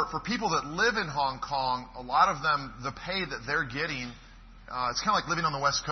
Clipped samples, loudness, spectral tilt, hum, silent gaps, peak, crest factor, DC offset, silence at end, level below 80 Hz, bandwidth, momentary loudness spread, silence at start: under 0.1%; -29 LUFS; -3 dB/octave; none; none; -10 dBFS; 20 dB; under 0.1%; 0 s; -52 dBFS; 6.4 kHz; 9 LU; 0 s